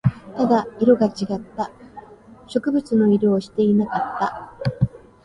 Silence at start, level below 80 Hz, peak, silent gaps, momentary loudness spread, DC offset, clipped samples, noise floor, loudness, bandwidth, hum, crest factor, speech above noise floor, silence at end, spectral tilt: 0.05 s; -50 dBFS; -4 dBFS; none; 11 LU; under 0.1%; under 0.1%; -44 dBFS; -21 LUFS; 10.5 kHz; none; 18 dB; 25 dB; 0.3 s; -8.5 dB/octave